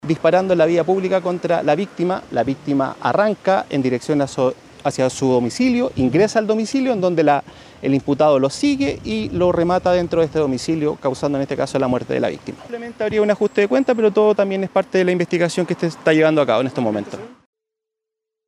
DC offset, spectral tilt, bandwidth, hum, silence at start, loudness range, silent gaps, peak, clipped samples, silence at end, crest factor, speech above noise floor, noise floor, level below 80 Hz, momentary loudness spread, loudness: under 0.1%; -6 dB/octave; 11.5 kHz; none; 0.05 s; 3 LU; none; -4 dBFS; under 0.1%; 1.15 s; 16 dB; 65 dB; -83 dBFS; -50 dBFS; 6 LU; -18 LUFS